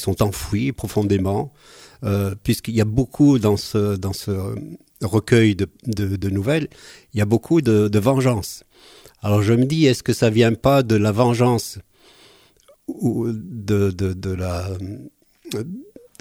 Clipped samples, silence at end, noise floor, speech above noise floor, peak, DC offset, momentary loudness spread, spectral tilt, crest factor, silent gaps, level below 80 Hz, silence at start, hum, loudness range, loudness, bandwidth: under 0.1%; 0.35 s; -54 dBFS; 35 dB; -2 dBFS; under 0.1%; 15 LU; -6.5 dB/octave; 18 dB; none; -44 dBFS; 0 s; none; 7 LU; -20 LUFS; 16 kHz